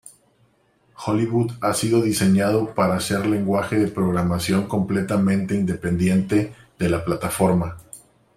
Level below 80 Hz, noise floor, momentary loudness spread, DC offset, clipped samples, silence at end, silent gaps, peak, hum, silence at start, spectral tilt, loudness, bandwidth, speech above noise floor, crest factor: -50 dBFS; -61 dBFS; 5 LU; under 0.1%; under 0.1%; 0.4 s; none; -4 dBFS; none; 0.05 s; -6 dB/octave; -21 LUFS; 15.5 kHz; 41 dB; 18 dB